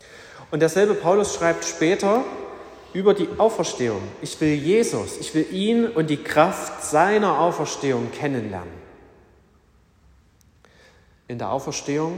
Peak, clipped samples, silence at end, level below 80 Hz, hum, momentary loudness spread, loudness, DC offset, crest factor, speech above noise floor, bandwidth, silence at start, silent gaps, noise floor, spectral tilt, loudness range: -4 dBFS; under 0.1%; 0 s; -58 dBFS; none; 14 LU; -22 LUFS; under 0.1%; 18 dB; 36 dB; 16 kHz; 0.1 s; none; -57 dBFS; -5 dB/octave; 13 LU